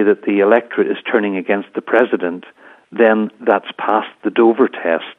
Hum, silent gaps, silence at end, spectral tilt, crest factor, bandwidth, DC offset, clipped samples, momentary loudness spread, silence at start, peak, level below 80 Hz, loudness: none; none; 0.05 s; -8 dB/octave; 16 dB; 3.9 kHz; under 0.1%; under 0.1%; 7 LU; 0 s; 0 dBFS; -70 dBFS; -16 LUFS